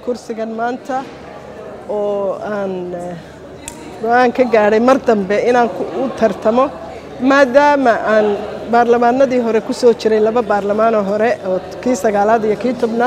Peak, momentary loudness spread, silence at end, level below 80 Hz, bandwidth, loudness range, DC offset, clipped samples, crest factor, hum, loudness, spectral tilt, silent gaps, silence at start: 0 dBFS; 19 LU; 0 s; -50 dBFS; 13.5 kHz; 9 LU; under 0.1%; under 0.1%; 14 dB; none; -15 LUFS; -5.5 dB/octave; none; 0 s